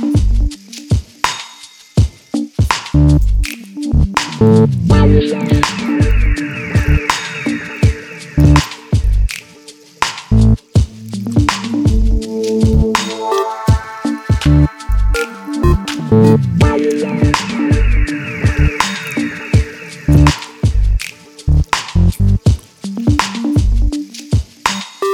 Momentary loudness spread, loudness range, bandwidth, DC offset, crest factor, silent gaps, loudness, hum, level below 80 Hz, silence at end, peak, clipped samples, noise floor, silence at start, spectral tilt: 10 LU; 3 LU; 15 kHz; under 0.1%; 14 dB; none; -15 LUFS; none; -18 dBFS; 0 s; 0 dBFS; under 0.1%; -39 dBFS; 0 s; -6 dB/octave